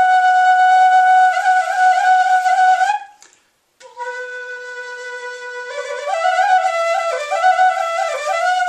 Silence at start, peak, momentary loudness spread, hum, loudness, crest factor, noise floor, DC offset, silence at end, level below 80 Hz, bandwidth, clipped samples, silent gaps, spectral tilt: 0 s; -4 dBFS; 17 LU; none; -14 LUFS; 12 dB; -57 dBFS; under 0.1%; 0 s; -80 dBFS; 10 kHz; under 0.1%; none; 3 dB/octave